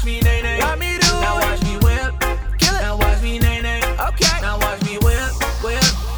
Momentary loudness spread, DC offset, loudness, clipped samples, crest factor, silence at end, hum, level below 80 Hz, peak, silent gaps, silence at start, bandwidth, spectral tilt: 5 LU; under 0.1%; -18 LUFS; under 0.1%; 14 dB; 0 s; none; -20 dBFS; -2 dBFS; none; 0 s; over 20 kHz; -3.5 dB/octave